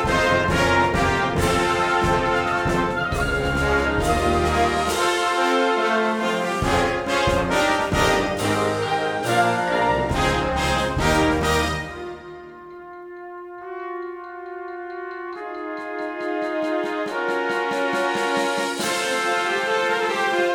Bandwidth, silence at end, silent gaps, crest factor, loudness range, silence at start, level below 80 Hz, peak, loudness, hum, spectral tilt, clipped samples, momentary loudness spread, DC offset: 18.5 kHz; 0 s; none; 18 dB; 11 LU; 0 s; -36 dBFS; -4 dBFS; -21 LUFS; none; -4.5 dB/octave; under 0.1%; 14 LU; under 0.1%